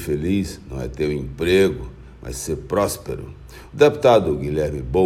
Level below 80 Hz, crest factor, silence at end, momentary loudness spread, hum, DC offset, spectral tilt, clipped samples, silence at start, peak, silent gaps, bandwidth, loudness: -38 dBFS; 20 dB; 0 s; 19 LU; none; under 0.1%; -5.5 dB/octave; under 0.1%; 0 s; 0 dBFS; none; 16 kHz; -20 LUFS